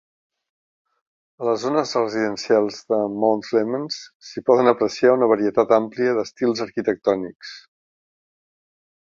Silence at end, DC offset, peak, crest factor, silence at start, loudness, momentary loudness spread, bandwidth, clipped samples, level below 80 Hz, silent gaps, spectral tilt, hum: 1.45 s; under 0.1%; -2 dBFS; 20 dB; 1.4 s; -20 LUFS; 11 LU; 7.6 kHz; under 0.1%; -66 dBFS; 4.15-4.20 s; -5 dB/octave; none